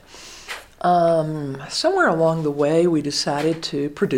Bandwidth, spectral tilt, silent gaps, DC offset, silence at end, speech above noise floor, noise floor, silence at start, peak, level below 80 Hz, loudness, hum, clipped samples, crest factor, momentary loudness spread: 16 kHz; -5 dB/octave; none; under 0.1%; 0 s; 21 dB; -41 dBFS; 0.1 s; -6 dBFS; -54 dBFS; -20 LUFS; none; under 0.1%; 14 dB; 16 LU